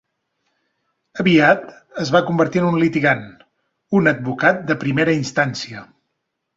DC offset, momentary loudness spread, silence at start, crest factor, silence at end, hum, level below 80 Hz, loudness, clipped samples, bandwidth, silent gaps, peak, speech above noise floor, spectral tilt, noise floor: under 0.1%; 14 LU; 1.15 s; 18 dB; 0.75 s; none; -58 dBFS; -17 LUFS; under 0.1%; 7.8 kHz; none; -2 dBFS; 58 dB; -6 dB/octave; -75 dBFS